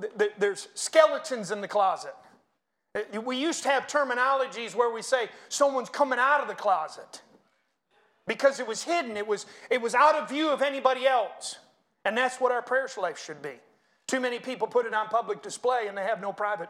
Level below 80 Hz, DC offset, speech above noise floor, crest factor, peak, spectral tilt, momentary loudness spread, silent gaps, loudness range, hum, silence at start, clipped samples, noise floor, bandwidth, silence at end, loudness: -84 dBFS; under 0.1%; 51 dB; 22 dB; -6 dBFS; -2.5 dB/octave; 13 LU; none; 4 LU; none; 0 s; under 0.1%; -78 dBFS; 14.5 kHz; 0 s; -27 LUFS